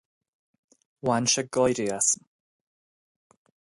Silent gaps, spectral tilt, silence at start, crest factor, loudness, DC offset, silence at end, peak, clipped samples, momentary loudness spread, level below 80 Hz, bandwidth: none; -3 dB/octave; 1.05 s; 20 dB; -25 LUFS; under 0.1%; 1.6 s; -10 dBFS; under 0.1%; 6 LU; -64 dBFS; 11.5 kHz